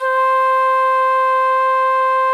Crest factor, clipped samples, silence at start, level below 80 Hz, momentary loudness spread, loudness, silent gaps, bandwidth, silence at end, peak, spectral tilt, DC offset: 6 dB; under 0.1%; 0 s; under -90 dBFS; 1 LU; -15 LUFS; none; 12.5 kHz; 0 s; -8 dBFS; 2 dB/octave; under 0.1%